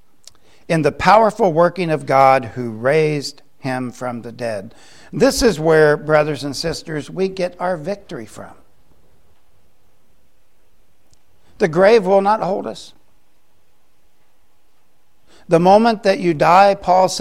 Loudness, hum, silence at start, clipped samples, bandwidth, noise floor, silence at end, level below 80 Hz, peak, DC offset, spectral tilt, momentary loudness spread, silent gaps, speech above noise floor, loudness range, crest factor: -16 LUFS; none; 0.7 s; under 0.1%; 15.5 kHz; -63 dBFS; 0 s; -46 dBFS; 0 dBFS; 0.7%; -5.5 dB/octave; 15 LU; none; 47 dB; 11 LU; 18 dB